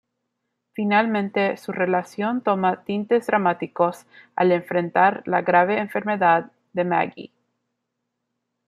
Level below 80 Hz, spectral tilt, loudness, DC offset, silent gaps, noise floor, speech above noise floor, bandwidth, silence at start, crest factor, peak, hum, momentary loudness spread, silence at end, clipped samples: -72 dBFS; -7 dB/octave; -22 LUFS; under 0.1%; none; -79 dBFS; 58 dB; 14 kHz; 0.8 s; 20 dB; -4 dBFS; none; 8 LU; 1.4 s; under 0.1%